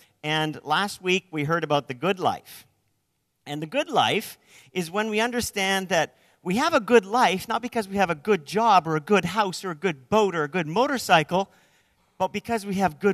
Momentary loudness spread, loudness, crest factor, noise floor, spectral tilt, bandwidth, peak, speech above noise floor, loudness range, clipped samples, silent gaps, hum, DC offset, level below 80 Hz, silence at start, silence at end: 9 LU; -24 LUFS; 20 dB; -74 dBFS; -4.5 dB/octave; 14 kHz; -4 dBFS; 50 dB; 5 LU; under 0.1%; none; none; under 0.1%; -60 dBFS; 0.25 s; 0 s